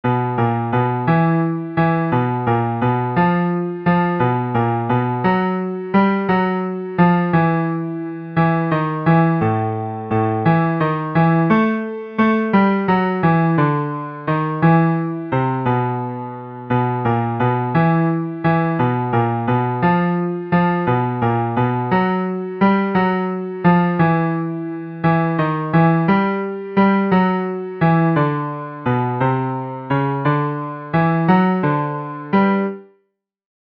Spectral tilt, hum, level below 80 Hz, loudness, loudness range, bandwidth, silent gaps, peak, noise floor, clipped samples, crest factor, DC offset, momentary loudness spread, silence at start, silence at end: -10.5 dB/octave; none; -52 dBFS; -18 LUFS; 2 LU; 5 kHz; none; 0 dBFS; -68 dBFS; under 0.1%; 16 dB; under 0.1%; 8 LU; 0.05 s; 0.75 s